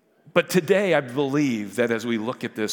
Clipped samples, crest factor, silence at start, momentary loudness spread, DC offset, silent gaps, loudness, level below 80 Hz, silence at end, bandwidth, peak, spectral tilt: under 0.1%; 20 dB; 0.35 s; 7 LU; under 0.1%; none; -23 LUFS; -76 dBFS; 0 s; 18 kHz; -2 dBFS; -5 dB/octave